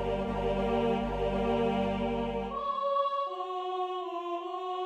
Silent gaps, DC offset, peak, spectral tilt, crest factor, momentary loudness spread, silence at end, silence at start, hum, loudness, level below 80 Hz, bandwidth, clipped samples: none; under 0.1%; -16 dBFS; -7.5 dB/octave; 14 dB; 7 LU; 0 s; 0 s; none; -32 LUFS; -46 dBFS; 10 kHz; under 0.1%